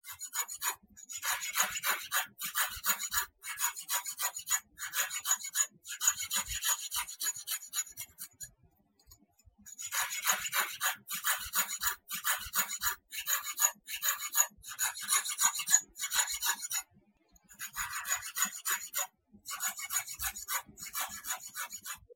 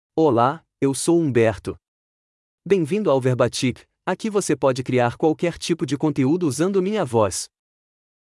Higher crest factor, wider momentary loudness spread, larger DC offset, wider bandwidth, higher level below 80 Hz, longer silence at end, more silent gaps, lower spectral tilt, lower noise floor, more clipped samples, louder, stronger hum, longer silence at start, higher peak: first, 26 dB vs 16 dB; first, 11 LU vs 8 LU; neither; first, 17 kHz vs 12 kHz; second, -64 dBFS vs -58 dBFS; second, 0 s vs 0.85 s; second, none vs 1.88-2.58 s; second, 2.5 dB/octave vs -5.5 dB/octave; second, -68 dBFS vs under -90 dBFS; neither; second, -32 LUFS vs -21 LUFS; neither; about the same, 0.05 s vs 0.15 s; second, -10 dBFS vs -4 dBFS